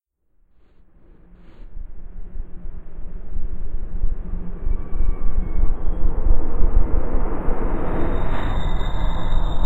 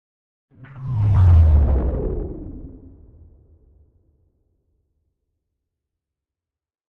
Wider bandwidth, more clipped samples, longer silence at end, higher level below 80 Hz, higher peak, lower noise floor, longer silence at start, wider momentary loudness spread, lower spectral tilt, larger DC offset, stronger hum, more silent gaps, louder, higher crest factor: first, 4 kHz vs 3 kHz; neither; second, 0 s vs 4.2 s; first, -20 dBFS vs -26 dBFS; first, -2 dBFS vs -6 dBFS; second, -59 dBFS vs -88 dBFS; second, 0.2 s vs 0.75 s; second, 16 LU vs 22 LU; second, -8.5 dB/octave vs -11 dB/octave; neither; neither; neither; second, -27 LUFS vs -18 LUFS; about the same, 14 dB vs 16 dB